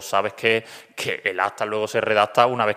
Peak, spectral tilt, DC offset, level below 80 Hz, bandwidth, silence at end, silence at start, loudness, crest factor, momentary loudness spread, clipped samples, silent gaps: -2 dBFS; -3.5 dB/octave; under 0.1%; -70 dBFS; 15.5 kHz; 0 s; 0 s; -22 LUFS; 20 dB; 8 LU; under 0.1%; none